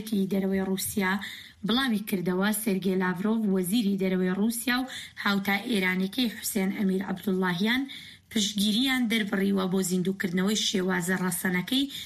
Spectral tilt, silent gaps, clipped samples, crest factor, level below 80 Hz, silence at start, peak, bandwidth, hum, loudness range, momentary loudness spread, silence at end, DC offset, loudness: -4.5 dB/octave; none; under 0.1%; 14 dB; -62 dBFS; 0 s; -14 dBFS; 15.5 kHz; none; 1 LU; 4 LU; 0 s; under 0.1%; -27 LUFS